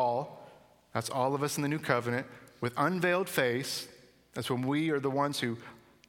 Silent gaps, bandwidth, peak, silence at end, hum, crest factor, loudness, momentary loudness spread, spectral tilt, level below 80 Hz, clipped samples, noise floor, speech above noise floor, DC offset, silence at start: none; 19 kHz; -10 dBFS; 0.3 s; none; 22 dB; -32 LUFS; 15 LU; -5 dB/octave; -72 dBFS; under 0.1%; -58 dBFS; 27 dB; under 0.1%; 0 s